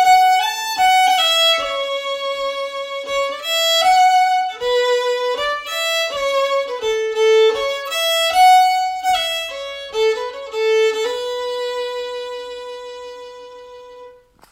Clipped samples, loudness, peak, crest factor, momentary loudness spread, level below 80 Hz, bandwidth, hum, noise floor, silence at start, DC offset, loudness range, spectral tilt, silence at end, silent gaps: under 0.1%; -17 LUFS; -2 dBFS; 16 dB; 15 LU; -56 dBFS; 16 kHz; none; -43 dBFS; 0 s; under 0.1%; 7 LU; 1 dB/octave; 0.4 s; none